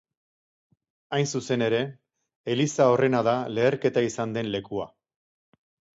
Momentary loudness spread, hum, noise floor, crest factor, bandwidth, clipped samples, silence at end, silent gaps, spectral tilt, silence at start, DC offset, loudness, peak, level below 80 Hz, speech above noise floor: 13 LU; none; under -90 dBFS; 20 dB; 8 kHz; under 0.1%; 1.1 s; 2.36-2.44 s; -5.5 dB/octave; 1.1 s; under 0.1%; -25 LUFS; -8 dBFS; -66 dBFS; over 66 dB